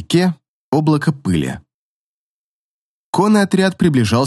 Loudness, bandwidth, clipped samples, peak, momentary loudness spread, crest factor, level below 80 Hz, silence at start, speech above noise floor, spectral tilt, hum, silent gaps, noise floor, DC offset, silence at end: -16 LUFS; 12.5 kHz; under 0.1%; -2 dBFS; 10 LU; 16 dB; -52 dBFS; 0 s; over 76 dB; -6.5 dB/octave; none; 0.48-0.72 s, 1.74-3.13 s; under -90 dBFS; under 0.1%; 0 s